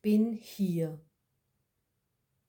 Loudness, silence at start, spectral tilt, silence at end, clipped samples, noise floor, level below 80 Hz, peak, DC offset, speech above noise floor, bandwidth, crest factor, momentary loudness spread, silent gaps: -32 LUFS; 0.05 s; -8 dB/octave; 1.5 s; under 0.1%; -81 dBFS; -76 dBFS; -18 dBFS; under 0.1%; 51 dB; 18 kHz; 16 dB; 11 LU; none